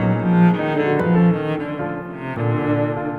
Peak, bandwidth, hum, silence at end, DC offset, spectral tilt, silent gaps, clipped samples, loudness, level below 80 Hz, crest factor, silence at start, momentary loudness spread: -4 dBFS; 4.3 kHz; none; 0 s; under 0.1%; -10 dB/octave; none; under 0.1%; -19 LUFS; -50 dBFS; 14 dB; 0 s; 11 LU